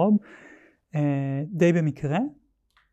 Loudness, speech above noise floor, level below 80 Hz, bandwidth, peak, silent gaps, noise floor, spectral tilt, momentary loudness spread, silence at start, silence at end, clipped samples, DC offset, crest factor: -25 LUFS; 43 dB; -64 dBFS; 8.2 kHz; -10 dBFS; none; -66 dBFS; -8.5 dB/octave; 9 LU; 0 s; 0.6 s; under 0.1%; under 0.1%; 16 dB